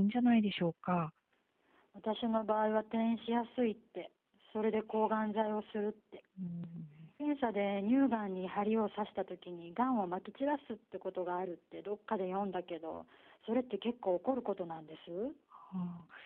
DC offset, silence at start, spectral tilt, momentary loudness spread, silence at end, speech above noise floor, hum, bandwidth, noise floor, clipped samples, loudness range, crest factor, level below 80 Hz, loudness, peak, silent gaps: under 0.1%; 0 s; -5.5 dB/octave; 14 LU; 0 s; 40 dB; none; 4.2 kHz; -76 dBFS; under 0.1%; 4 LU; 16 dB; -76 dBFS; -37 LUFS; -20 dBFS; none